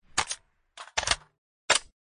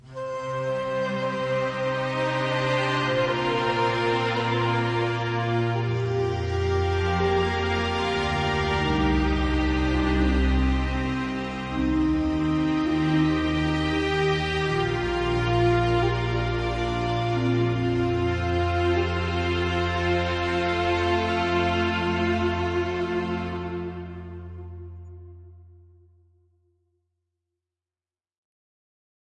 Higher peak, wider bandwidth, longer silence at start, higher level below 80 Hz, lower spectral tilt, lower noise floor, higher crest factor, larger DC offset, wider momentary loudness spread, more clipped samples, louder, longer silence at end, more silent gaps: first, -6 dBFS vs -12 dBFS; about the same, 11 kHz vs 10.5 kHz; about the same, 0.15 s vs 0.05 s; second, -52 dBFS vs -36 dBFS; second, 0.5 dB/octave vs -6.5 dB/octave; second, -50 dBFS vs under -90 dBFS; first, 26 dB vs 14 dB; neither; first, 17 LU vs 6 LU; neither; second, -28 LUFS vs -25 LUFS; second, 0.3 s vs 3.6 s; first, 1.38-1.69 s vs none